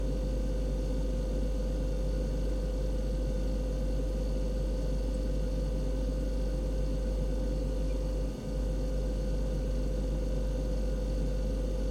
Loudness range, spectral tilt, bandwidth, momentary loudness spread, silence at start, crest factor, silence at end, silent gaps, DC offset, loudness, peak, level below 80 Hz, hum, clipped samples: 0 LU; -7.5 dB/octave; 10 kHz; 0 LU; 0 s; 10 dB; 0 s; none; under 0.1%; -34 LUFS; -20 dBFS; -32 dBFS; none; under 0.1%